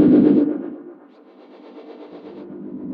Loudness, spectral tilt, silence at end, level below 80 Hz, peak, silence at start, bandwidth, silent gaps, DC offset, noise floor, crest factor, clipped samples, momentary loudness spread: -16 LUFS; -11.5 dB/octave; 0 s; -58 dBFS; -2 dBFS; 0 s; 4.4 kHz; none; under 0.1%; -47 dBFS; 18 dB; under 0.1%; 27 LU